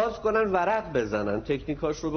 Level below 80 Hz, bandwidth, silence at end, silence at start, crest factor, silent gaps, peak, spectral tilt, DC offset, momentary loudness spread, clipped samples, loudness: -48 dBFS; 6.6 kHz; 0 s; 0 s; 16 dB; none; -10 dBFS; -5 dB/octave; under 0.1%; 6 LU; under 0.1%; -27 LUFS